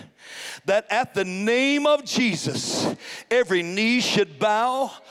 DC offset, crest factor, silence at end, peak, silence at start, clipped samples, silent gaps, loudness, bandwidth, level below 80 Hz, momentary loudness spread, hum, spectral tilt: under 0.1%; 16 dB; 0.1 s; -8 dBFS; 0 s; under 0.1%; none; -22 LUFS; 15.5 kHz; -68 dBFS; 9 LU; none; -3.5 dB/octave